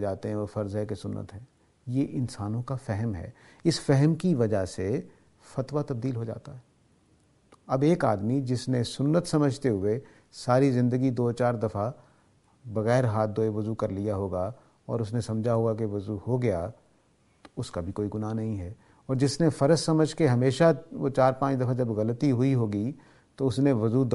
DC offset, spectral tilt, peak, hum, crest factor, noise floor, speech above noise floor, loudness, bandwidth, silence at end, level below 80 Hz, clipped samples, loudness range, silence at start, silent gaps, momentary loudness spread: under 0.1%; -7 dB/octave; -8 dBFS; none; 20 dB; -64 dBFS; 38 dB; -27 LUFS; 11.5 kHz; 0 s; -58 dBFS; under 0.1%; 7 LU; 0 s; none; 12 LU